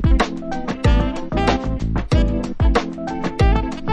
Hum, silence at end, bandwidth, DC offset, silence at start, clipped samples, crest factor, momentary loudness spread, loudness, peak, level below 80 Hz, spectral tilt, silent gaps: none; 0 s; 9.6 kHz; under 0.1%; 0 s; under 0.1%; 14 dB; 7 LU; -20 LUFS; -2 dBFS; -20 dBFS; -7 dB/octave; none